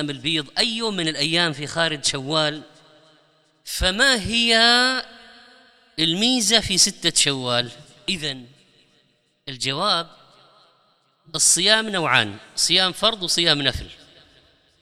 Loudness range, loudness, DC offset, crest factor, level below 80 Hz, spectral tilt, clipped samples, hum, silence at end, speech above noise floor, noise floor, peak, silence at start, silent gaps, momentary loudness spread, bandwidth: 7 LU; -19 LUFS; under 0.1%; 22 dB; -46 dBFS; -1.5 dB/octave; under 0.1%; none; 0.9 s; 43 dB; -64 dBFS; 0 dBFS; 0 s; none; 15 LU; 17 kHz